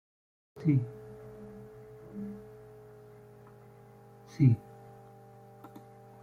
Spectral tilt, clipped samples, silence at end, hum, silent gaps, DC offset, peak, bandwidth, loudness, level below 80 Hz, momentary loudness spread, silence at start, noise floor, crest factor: -10 dB/octave; under 0.1%; 0.55 s; none; none; under 0.1%; -12 dBFS; 6.6 kHz; -31 LUFS; -66 dBFS; 27 LU; 0.55 s; -55 dBFS; 24 dB